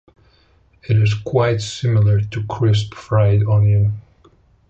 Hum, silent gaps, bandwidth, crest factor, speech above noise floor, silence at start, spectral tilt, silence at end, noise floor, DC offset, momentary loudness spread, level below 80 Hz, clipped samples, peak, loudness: none; none; 8 kHz; 14 dB; 39 dB; 0.9 s; -7 dB/octave; 0.7 s; -54 dBFS; under 0.1%; 6 LU; -40 dBFS; under 0.1%; -4 dBFS; -17 LUFS